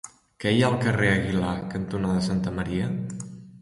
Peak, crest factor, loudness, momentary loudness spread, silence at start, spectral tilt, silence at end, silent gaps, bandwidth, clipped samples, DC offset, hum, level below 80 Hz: -8 dBFS; 18 dB; -25 LUFS; 13 LU; 0.05 s; -6 dB/octave; 0.05 s; none; 11.5 kHz; under 0.1%; under 0.1%; none; -46 dBFS